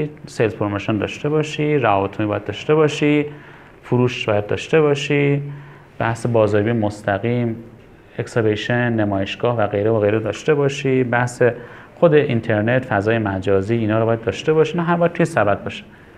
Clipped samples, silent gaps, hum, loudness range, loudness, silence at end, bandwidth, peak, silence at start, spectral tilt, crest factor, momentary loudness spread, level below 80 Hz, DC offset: under 0.1%; none; none; 2 LU; -19 LUFS; 0.35 s; 11 kHz; 0 dBFS; 0 s; -6.5 dB/octave; 18 dB; 7 LU; -54 dBFS; under 0.1%